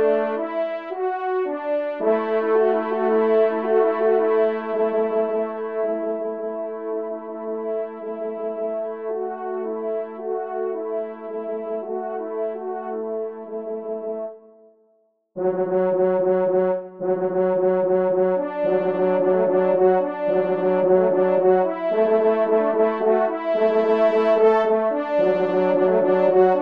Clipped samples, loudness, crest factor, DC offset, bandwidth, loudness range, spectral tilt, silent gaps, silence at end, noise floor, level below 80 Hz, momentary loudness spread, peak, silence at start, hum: under 0.1%; -21 LUFS; 16 dB; 0.2%; 5.2 kHz; 9 LU; -9 dB/octave; none; 0 s; -64 dBFS; -74 dBFS; 11 LU; -6 dBFS; 0 s; none